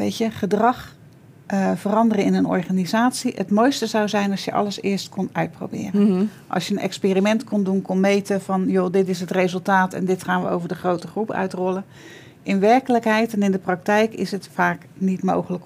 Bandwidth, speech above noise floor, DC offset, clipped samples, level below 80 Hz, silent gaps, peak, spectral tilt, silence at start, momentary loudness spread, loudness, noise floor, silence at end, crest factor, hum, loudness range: 15.5 kHz; 24 dB; under 0.1%; under 0.1%; -64 dBFS; none; -4 dBFS; -6 dB/octave; 0 s; 7 LU; -21 LUFS; -45 dBFS; 0 s; 16 dB; none; 2 LU